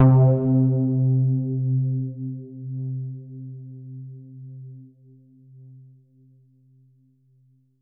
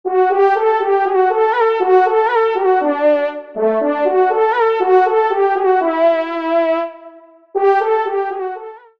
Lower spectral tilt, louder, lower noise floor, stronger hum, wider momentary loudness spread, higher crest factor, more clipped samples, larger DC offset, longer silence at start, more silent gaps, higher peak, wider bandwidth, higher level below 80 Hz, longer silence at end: first, -13.5 dB/octave vs -5.5 dB/octave; second, -22 LUFS vs -15 LUFS; first, -60 dBFS vs -41 dBFS; neither; first, 22 LU vs 7 LU; about the same, 18 dB vs 14 dB; neither; second, under 0.1% vs 0.2%; about the same, 0 s vs 0.05 s; neither; second, -6 dBFS vs -2 dBFS; second, 1.9 kHz vs 5.6 kHz; first, -60 dBFS vs -68 dBFS; first, 3 s vs 0.2 s